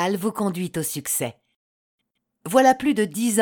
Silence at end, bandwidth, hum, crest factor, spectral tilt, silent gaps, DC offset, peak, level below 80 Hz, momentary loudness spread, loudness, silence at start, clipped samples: 0 s; 19 kHz; none; 20 dB; -4 dB/octave; 1.56-1.98 s; under 0.1%; -4 dBFS; -64 dBFS; 9 LU; -22 LUFS; 0 s; under 0.1%